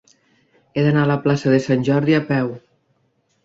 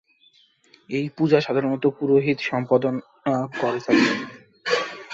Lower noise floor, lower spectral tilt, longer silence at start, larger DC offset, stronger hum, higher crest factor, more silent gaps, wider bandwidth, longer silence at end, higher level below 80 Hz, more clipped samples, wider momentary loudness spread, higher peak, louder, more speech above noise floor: first, -65 dBFS vs -59 dBFS; first, -7.5 dB/octave vs -6 dB/octave; second, 0.75 s vs 0.9 s; neither; neither; about the same, 16 dB vs 20 dB; neither; about the same, 7.8 kHz vs 8 kHz; first, 0.85 s vs 0 s; first, -58 dBFS vs -66 dBFS; neither; about the same, 10 LU vs 9 LU; about the same, -4 dBFS vs -4 dBFS; first, -18 LUFS vs -22 LUFS; first, 48 dB vs 37 dB